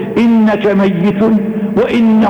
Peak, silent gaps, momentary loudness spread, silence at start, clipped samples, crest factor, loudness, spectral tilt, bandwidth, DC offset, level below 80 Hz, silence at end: -6 dBFS; none; 4 LU; 0 s; under 0.1%; 6 dB; -11 LUFS; -8.5 dB/octave; 6.4 kHz; under 0.1%; -44 dBFS; 0 s